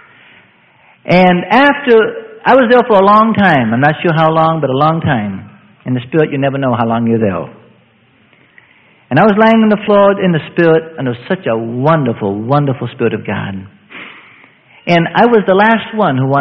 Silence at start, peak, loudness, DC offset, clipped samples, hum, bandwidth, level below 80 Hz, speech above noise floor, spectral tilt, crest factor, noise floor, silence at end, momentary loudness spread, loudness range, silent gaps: 1.1 s; 0 dBFS; -11 LUFS; under 0.1%; 0.2%; none; 6.2 kHz; -52 dBFS; 39 dB; -8.5 dB/octave; 12 dB; -50 dBFS; 0 s; 12 LU; 7 LU; none